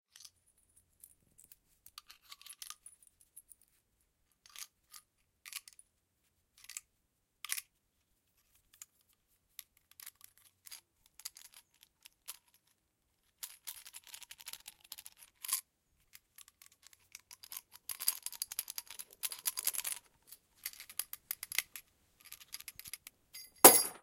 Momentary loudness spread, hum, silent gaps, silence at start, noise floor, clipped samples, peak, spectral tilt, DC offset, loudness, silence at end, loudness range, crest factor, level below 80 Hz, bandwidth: 20 LU; none; none; 2.5 s; -80 dBFS; under 0.1%; 0 dBFS; -0.5 dB/octave; under 0.1%; -31 LUFS; 0.1 s; 16 LU; 40 dB; -82 dBFS; 17 kHz